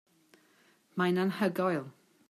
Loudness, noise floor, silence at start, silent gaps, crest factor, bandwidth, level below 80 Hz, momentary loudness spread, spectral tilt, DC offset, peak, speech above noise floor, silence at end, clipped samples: -31 LUFS; -66 dBFS; 0.95 s; none; 16 dB; 14.5 kHz; -80 dBFS; 12 LU; -7 dB/octave; under 0.1%; -16 dBFS; 36 dB; 0.4 s; under 0.1%